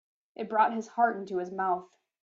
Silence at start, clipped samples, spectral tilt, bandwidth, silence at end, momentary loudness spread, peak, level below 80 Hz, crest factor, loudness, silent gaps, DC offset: 0.4 s; under 0.1%; -6 dB/octave; 7.6 kHz; 0.4 s; 8 LU; -12 dBFS; -80 dBFS; 18 dB; -29 LUFS; none; under 0.1%